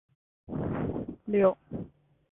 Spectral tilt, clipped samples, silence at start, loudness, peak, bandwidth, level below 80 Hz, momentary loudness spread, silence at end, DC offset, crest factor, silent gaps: -12 dB/octave; under 0.1%; 0.5 s; -30 LUFS; -12 dBFS; 3.8 kHz; -52 dBFS; 16 LU; 0.45 s; under 0.1%; 20 dB; none